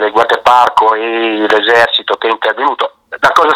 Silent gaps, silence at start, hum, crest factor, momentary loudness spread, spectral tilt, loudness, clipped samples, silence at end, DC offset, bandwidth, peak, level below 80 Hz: none; 0 s; none; 10 dB; 6 LU; -3 dB/octave; -11 LUFS; 0.7%; 0 s; under 0.1%; 17 kHz; 0 dBFS; -50 dBFS